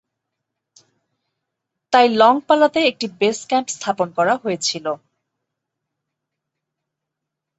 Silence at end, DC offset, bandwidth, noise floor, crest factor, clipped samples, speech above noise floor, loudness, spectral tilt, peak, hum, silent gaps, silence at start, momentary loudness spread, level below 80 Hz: 2.65 s; under 0.1%; 8.2 kHz; -82 dBFS; 20 dB; under 0.1%; 64 dB; -18 LUFS; -3 dB/octave; -2 dBFS; none; none; 1.9 s; 10 LU; -70 dBFS